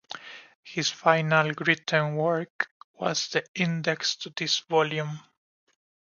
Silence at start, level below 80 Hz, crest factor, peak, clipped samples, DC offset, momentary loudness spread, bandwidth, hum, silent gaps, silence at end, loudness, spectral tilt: 0.1 s; -74 dBFS; 22 dB; -4 dBFS; under 0.1%; under 0.1%; 13 LU; 7.4 kHz; none; 0.55-0.63 s, 2.50-2.59 s, 2.71-2.94 s, 3.48-3.54 s; 0.95 s; -26 LUFS; -4 dB/octave